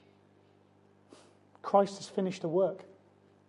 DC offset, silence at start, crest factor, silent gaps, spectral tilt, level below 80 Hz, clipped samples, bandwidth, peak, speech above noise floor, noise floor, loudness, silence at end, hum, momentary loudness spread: under 0.1%; 1.65 s; 24 dB; none; -6.5 dB/octave; -82 dBFS; under 0.1%; 11 kHz; -10 dBFS; 34 dB; -64 dBFS; -31 LUFS; 0.65 s; 50 Hz at -55 dBFS; 13 LU